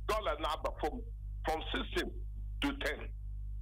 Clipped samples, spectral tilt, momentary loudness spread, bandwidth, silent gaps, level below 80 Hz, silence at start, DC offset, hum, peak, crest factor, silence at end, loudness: under 0.1%; -5 dB/octave; 10 LU; 16 kHz; none; -42 dBFS; 0 s; under 0.1%; 50 Hz at -45 dBFS; -22 dBFS; 16 dB; 0 s; -38 LUFS